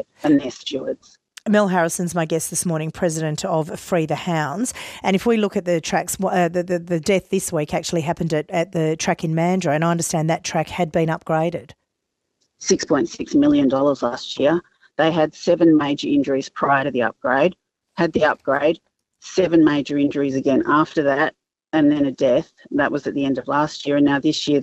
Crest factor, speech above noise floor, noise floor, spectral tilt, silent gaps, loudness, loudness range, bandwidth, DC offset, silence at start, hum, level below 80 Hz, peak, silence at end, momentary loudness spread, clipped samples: 16 dB; 58 dB; -77 dBFS; -5 dB/octave; none; -20 LUFS; 3 LU; 14.5 kHz; under 0.1%; 0.25 s; none; -56 dBFS; -4 dBFS; 0 s; 7 LU; under 0.1%